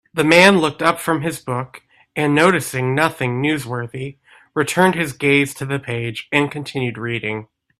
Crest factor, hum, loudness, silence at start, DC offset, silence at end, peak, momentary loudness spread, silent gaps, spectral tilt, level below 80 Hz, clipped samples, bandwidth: 18 dB; none; -18 LUFS; 0.15 s; under 0.1%; 0.35 s; 0 dBFS; 13 LU; none; -5 dB/octave; -56 dBFS; under 0.1%; 15.5 kHz